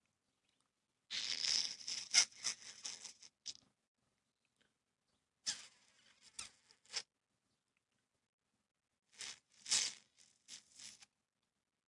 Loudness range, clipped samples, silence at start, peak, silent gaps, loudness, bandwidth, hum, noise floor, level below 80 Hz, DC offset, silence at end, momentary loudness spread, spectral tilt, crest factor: 15 LU; under 0.1%; 1.1 s; -14 dBFS; 3.88-3.95 s, 8.29-8.38 s; -39 LUFS; 12 kHz; none; -86 dBFS; -88 dBFS; under 0.1%; 0.85 s; 23 LU; 3 dB/octave; 32 dB